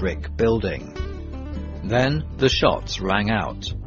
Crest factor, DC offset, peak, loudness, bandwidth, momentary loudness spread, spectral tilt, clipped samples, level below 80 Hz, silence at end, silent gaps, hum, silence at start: 22 dB; under 0.1%; -2 dBFS; -23 LUFS; 7.4 kHz; 13 LU; -5.5 dB/octave; under 0.1%; -34 dBFS; 0 s; none; none; 0 s